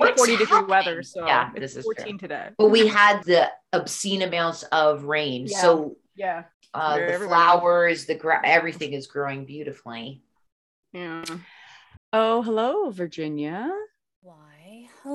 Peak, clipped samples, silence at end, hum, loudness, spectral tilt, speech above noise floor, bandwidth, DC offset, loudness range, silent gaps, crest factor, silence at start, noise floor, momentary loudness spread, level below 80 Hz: -4 dBFS; under 0.1%; 0 s; none; -22 LUFS; -3.5 dB/octave; 28 dB; 12.5 kHz; under 0.1%; 8 LU; 6.54-6.61 s, 10.52-10.83 s, 11.97-12.12 s, 14.16-14.22 s; 20 dB; 0 s; -50 dBFS; 18 LU; -70 dBFS